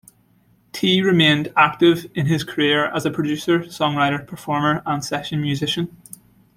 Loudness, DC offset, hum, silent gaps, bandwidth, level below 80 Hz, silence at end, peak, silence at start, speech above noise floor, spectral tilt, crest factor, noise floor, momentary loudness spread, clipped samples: -19 LUFS; under 0.1%; none; none; 16 kHz; -56 dBFS; 0.7 s; -2 dBFS; 0.75 s; 39 dB; -5.5 dB/octave; 18 dB; -58 dBFS; 9 LU; under 0.1%